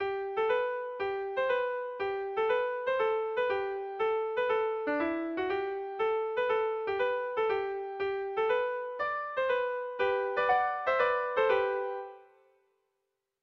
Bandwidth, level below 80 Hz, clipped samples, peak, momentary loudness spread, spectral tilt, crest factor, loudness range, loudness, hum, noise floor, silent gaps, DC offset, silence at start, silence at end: 6 kHz; -68 dBFS; under 0.1%; -14 dBFS; 7 LU; -5.5 dB/octave; 16 dB; 2 LU; -31 LUFS; none; -83 dBFS; none; under 0.1%; 0 s; 1.2 s